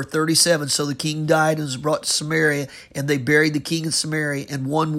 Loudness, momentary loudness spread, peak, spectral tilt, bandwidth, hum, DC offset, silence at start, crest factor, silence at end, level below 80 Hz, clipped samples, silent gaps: -20 LUFS; 8 LU; -4 dBFS; -3.5 dB/octave; 16 kHz; none; under 0.1%; 0 s; 18 dB; 0 s; -58 dBFS; under 0.1%; none